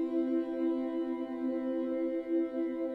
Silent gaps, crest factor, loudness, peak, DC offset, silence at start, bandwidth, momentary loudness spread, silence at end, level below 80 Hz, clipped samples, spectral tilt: none; 12 dB; -34 LUFS; -22 dBFS; under 0.1%; 0 s; 4.7 kHz; 3 LU; 0 s; -72 dBFS; under 0.1%; -7.5 dB/octave